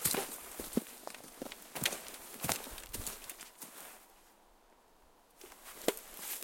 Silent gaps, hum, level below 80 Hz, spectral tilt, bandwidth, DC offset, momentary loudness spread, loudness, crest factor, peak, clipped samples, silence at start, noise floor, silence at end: none; none; -62 dBFS; -2 dB/octave; 17 kHz; under 0.1%; 16 LU; -40 LUFS; 34 dB; -8 dBFS; under 0.1%; 0 s; -65 dBFS; 0 s